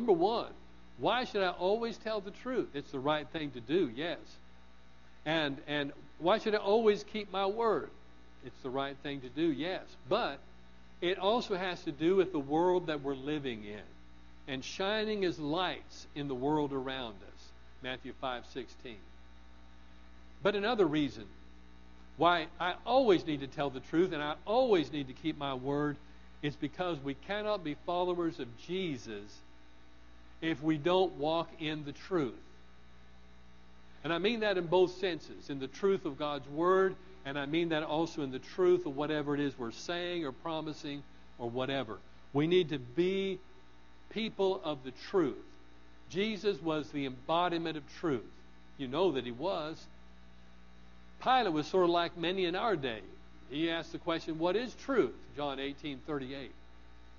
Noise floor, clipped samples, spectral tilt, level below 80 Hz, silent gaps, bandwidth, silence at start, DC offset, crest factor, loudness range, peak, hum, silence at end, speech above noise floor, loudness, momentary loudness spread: -60 dBFS; under 0.1%; -3.5 dB/octave; -60 dBFS; none; 7.2 kHz; 0 s; 0.2%; 22 dB; 5 LU; -12 dBFS; 60 Hz at -60 dBFS; 0 s; 27 dB; -34 LUFS; 14 LU